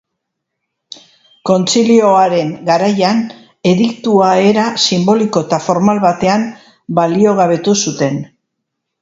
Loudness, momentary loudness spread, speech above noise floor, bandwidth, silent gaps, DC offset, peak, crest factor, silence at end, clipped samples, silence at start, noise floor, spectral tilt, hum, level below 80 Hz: -12 LUFS; 8 LU; 63 dB; 8 kHz; none; under 0.1%; 0 dBFS; 14 dB; 0.75 s; under 0.1%; 1.45 s; -75 dBFS; -5 dB/octave; none; -56 dBFS